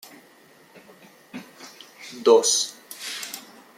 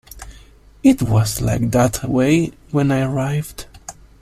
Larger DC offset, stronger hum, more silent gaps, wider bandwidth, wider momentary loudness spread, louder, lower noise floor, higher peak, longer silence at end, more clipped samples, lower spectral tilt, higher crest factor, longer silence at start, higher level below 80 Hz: neither; neither; neither; about the same, 16 kHz vs 15.5 kHz; first, 25 LU vs 21 LU; second, -22 LUFS vs -18 LUFS; first, -53 dBFS vs -45 dBFS; about the same, -4 dBFS vs -2 dBFS; about the same, 0.4 s vs 0.3 s; neither; second, -1 dB/octave vs -6.5 dB/octave; about the same, 22 dB vs 18 dB; first, 1.35 s vs 0.15 s; second, -82 dBFS vs -38 dBFS